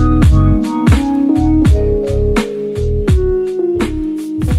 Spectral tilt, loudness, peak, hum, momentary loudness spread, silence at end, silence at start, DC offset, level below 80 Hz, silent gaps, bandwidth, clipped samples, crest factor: -8 dB/octave; -14 LUFS; 0 dBFS; none; 8 LU; 0 s; 0 s; under 0.1%; -18 dBFS; none; 13 kHz; under 0.1%; 12 dB